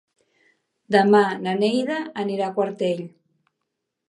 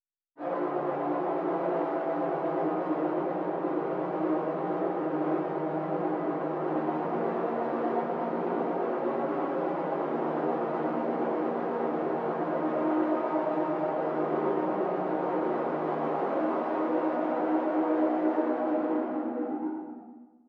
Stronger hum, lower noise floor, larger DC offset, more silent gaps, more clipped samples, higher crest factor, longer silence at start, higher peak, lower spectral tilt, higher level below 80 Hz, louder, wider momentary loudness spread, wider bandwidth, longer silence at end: neither; first, -80 dBFS vs -50 dBFS; neither; neither; neither; first, 22 dB vs 14 dB; first, 0.9 s vs 0.4 s; first, -2 dBFS vs -16 dBFS; second, -6 dB/octave vs -9.5 dB/octave; first, -74 dBFS vs -84 dBFS; first, -22 LUFS vs -30 LUFS; first, 10 LU vs 3 LU; first, 11 kHz vs 5 kHz; first, 1 s vs 0.2 s